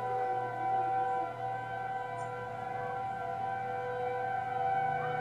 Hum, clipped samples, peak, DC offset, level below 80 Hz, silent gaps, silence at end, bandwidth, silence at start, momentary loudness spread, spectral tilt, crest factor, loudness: none; under 0.1%; -22 dBFS; under 0.1%; -70 dBFS; none; 0 s; 10 kHz; 0 s; 6 LU; -6 dB/octave; 12 dB; -35 LUFS